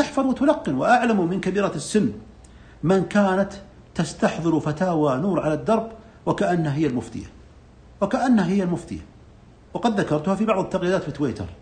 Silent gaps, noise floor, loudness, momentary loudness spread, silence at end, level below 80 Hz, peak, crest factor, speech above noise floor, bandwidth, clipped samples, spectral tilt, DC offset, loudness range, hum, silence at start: none; -48 dBFS; -22 LUFS; 12 LU; 0.05 s; -50 dBFS; -4 dBFS; 18 dB; 27 dB; 10 kHz; under 0.1%; -6.5 dB/octave; under 0.1%; 3 LU; none; 0 s